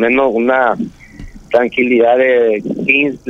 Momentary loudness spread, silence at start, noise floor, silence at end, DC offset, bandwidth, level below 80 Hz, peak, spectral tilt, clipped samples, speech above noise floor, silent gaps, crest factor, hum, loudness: 6 LU; 0 s; -33 dBFS; 0 s; under 0.1%; 7.6 kHz; -42 dBFS; 0 dBFS; -6.5 dB/octave; under 0.1%; 21 dB; none; 12 dB; none; -13 LUFS